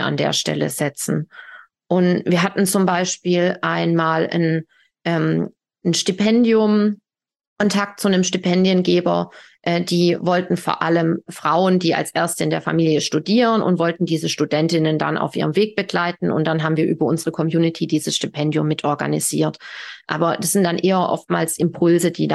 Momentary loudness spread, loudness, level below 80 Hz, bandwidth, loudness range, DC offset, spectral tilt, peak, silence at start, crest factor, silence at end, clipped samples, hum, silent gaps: 6 LU; -19 LUFS; -64 dBFS; 12.5 kHz; 2 LU; under 0.1%; -5 dB/octave; -2 dBFS; 0 s; 16 dB; 0 s; under 0.1%; none; 7.47-7.56 s